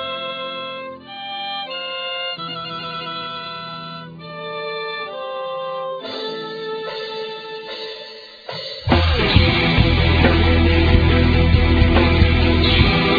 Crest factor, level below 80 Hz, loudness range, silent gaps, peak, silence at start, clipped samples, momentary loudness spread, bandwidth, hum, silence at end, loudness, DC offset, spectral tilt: 18 dB; -24 dBFS; 13 LU; none; 0 dBFS; 0 s; under 0.1%; 16 LU; 5 kHz; none; 0 s; -19 LUFS; under 0.1%; -8 dB/octave